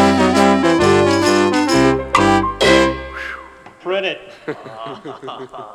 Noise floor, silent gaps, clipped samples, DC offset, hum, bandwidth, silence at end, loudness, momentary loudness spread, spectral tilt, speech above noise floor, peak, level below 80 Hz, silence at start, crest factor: -38 dBFS; none; under 0.1%; under 0.1%; none; 14 kHz; 0 s; -14 LUFS; 18 LU; -4.5 dB/octave; 8 dB; 0 dBFS; -38 dBFS; 0 s; 16 dB